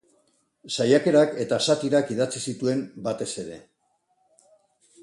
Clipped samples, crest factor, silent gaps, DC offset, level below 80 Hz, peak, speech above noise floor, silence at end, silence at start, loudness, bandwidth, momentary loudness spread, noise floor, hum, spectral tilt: under 0.1%; 20 dB; none; under 0.1%; -68 dBFS; -6 dBFS; 47 dB; 1.45 s; 0.65 s; -24 LUFS; 11.5 kHz; 12 LU; -70 dBFS; none; -4.5 dB/octave